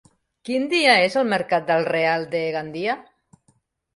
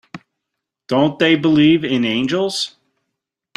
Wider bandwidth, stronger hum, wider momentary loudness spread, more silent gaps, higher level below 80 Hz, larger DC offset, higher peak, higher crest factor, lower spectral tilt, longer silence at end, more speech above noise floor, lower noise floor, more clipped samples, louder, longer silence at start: about the same, 11.5 kHz vs 11.5 kHz; neither; first, 11 LU vs 8 LU; neither; second, -68 dBFS vs -56 dBFS; neither; second, -4 dBFS vs 0 dBFS; about the same, 20 dB vs 18 dB; about the same, -4.5 dB/octave vs -5.5 dB/octave; about the same, 0.95 s vs 0.9 s; second, 44 dB vs 65 dB; second, -65 dBFS vs -80 dBFS; neither; second, -21 LUFS vs -16 LUFS; first, 0.45 s vs 0.15 s